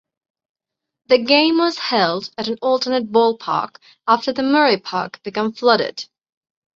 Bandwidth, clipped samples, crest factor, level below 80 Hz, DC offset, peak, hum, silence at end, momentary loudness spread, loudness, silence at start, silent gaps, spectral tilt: 7.6 kHz; under 0.1%; 18 dB; -66 dBFS; under 0.1%; -2 dBFS; none; 0.7 s; 12 LU; -18 LUFS; 1.1 s; none; -4.5 dB/octave